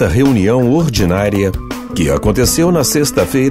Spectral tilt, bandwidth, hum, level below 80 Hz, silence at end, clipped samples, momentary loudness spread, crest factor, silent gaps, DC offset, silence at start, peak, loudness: -5.5 dB/octave; 16.5 kHz; none; -28 dBFS; 0 s; under 0.1%; 6 LU; 12 dB; none; under 0.1%; 0 s; 0 dBFS; -13 LUFS